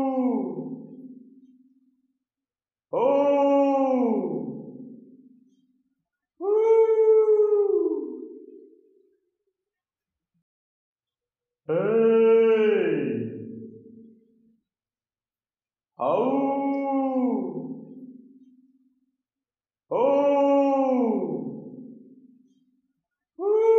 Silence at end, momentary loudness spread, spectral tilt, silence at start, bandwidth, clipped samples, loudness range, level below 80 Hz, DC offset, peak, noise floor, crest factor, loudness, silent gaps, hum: 0 s; 22 LU; -8.5 dB/octave; 0 s; 6.2 kHz; under 0.1%; 8 LU; -86 dBFS; under 0.1%; -10 dBFS; under -90 dBFS; 14 dB; -23 LUFS; 10.42-10.96 s; none